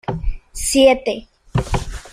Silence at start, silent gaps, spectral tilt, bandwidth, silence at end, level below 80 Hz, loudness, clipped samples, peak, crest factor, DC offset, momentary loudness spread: 0.1 s; none; -4.5 dB/octave; 15.5 kHz; 0.05 s; -28 dBFS; -18 LUFS; under 0.1%; -2 dBFS; 16 dB; under 0.1%; 16 LU